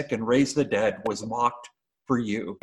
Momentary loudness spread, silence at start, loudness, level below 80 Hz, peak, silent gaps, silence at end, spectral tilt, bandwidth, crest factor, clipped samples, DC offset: 8 LU; 0 s; -26 LUFS; -60 dBFS; -10 dBFS; none; 0.05 s; -5.5 dB/octave; 12 kHz; 16 dB; under 0.1%; under 0.1%